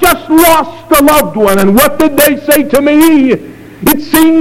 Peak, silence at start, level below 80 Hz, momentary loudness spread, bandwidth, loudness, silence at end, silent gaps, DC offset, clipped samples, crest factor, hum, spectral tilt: 0 dBFS; 0 s; -32 dBFS; 5 LU; over 20 kHz; -8 LUFS; 0 s; none; 4%; 1%; 8 dB; none; -4 dB/octave